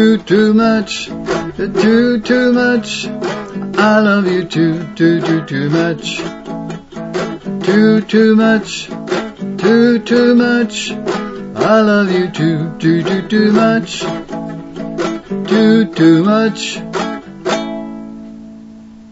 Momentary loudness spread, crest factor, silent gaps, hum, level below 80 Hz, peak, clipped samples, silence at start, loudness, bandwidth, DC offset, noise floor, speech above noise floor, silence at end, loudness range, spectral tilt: 14 LU; 14 dB; none; none; -48 dBFS; 0 dBFS; under 0.1%; 0 s; -13 LUFS; 8 kHz; under 0.1%; -35 dBFS; 23 dB; 0 s; 3 LU; -6 dB/octave